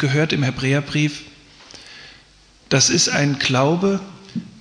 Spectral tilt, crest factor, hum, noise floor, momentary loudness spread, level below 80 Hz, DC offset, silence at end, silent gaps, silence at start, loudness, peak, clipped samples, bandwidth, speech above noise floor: -4 dB/octave; 16 dB; none; -51 dBFS; 23 LU; -52 dBFS; under 0.1%; 0 s; none; 0 s; -18 LUFS; -4 dBFS; under 0.1%; 10.5 kHz; 32 dB